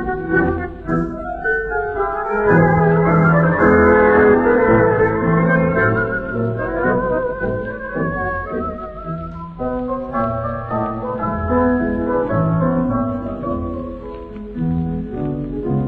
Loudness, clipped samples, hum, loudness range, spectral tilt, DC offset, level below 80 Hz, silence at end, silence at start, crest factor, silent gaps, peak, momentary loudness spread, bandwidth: -17 LUFS; under 0.1%; none; 10 LU; -11 dB/octave; under 0.1%; -34 dBFS; 0 s; 0 s; 16 dB; none; -2 dBFS; 12 LU; 4.1 kHz